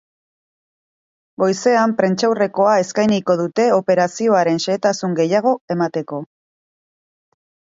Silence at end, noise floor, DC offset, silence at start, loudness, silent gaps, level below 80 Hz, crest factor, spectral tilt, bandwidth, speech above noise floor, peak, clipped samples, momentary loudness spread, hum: 1.5 s; under -90 dBFS; under 0.1%; 1.4 s; -17 LUFS; 5.61-5.68 s; -66 dBFS; 18 dB; -5.5 dB/octave; 7.8 kHz; over 73 dB; 0 dBFS; under 0.1%; 5 LU; none